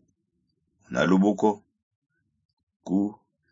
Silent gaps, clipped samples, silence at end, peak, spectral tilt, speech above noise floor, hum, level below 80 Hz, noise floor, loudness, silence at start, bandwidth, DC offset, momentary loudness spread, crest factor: 1.83-2.02 s, 2.45-2.57 s, 2.63-2.67 s, 2.76-2.80 s; under 0.1%; 0.4 s; -8 dBFS; -7 dB/octave; 53 dB; none; -64 dBFS; -76 dBFS; -25 LUFS; 0.9 s; 7.6 kHz; under 0.1%; 14 LU; 20 dB